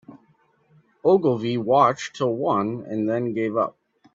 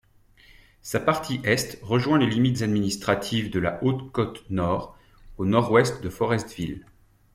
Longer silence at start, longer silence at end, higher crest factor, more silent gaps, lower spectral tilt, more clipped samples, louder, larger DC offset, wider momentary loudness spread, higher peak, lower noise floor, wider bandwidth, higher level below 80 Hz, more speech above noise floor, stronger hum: second, 0.1 s vs 0.85 s; about the same, 0.45 s vs 0.55 s; about the same, 20 dB vs 20 dB; neither; about the same, -6.5 dB/octave vs -5.5 dB/octave; neither; first, -22 LUFS vs -25 LUFS; neither; about the same, 8 LU vs 9 LU; about the same, -4 dBFS vs -4 dBFS; first, -62 dBFS vs -55 dBFS; second, 7.8 kHz vs 16 kHz; second, -66 dBFS vs -50 dBFS; first, 40 dB vs 31 dB; neither